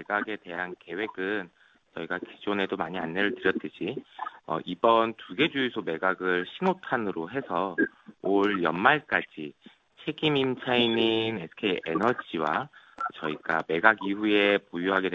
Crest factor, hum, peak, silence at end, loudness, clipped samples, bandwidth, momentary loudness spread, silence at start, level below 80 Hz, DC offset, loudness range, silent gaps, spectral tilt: 26 dB; none; -2 dBFS; 0 s; -27 LUFS; under 0.1%; 7.6 kHz; 12 LU; 0 s; -66 dBFS; under 0.1%; 5 LU; none; -6.5 dB/octave